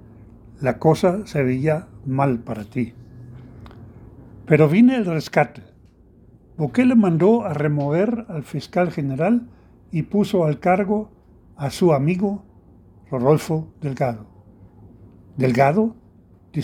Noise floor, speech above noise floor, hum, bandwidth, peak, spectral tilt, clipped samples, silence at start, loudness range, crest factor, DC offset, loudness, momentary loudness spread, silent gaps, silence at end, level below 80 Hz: -50 dBFS; 31 dB; none; 15 kHz; 0 dBFS; -8 dB/octave; under 0.1%; 0.6 s; 5 LU; 20 dB; under 0.1%; -20 LUFS; 14 LU; none; 0 s; -52 dBFS